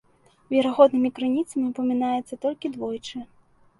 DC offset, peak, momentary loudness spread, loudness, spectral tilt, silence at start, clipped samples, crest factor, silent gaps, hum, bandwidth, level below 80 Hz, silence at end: under 0.1%; -2 dBFS; 14 LU; -24 LUFS; -5.5 dB/octave; 0.5 s; under 0.1%; 22 dB; none; none; 11.5 kHz; -66 dBFS; 0.55 s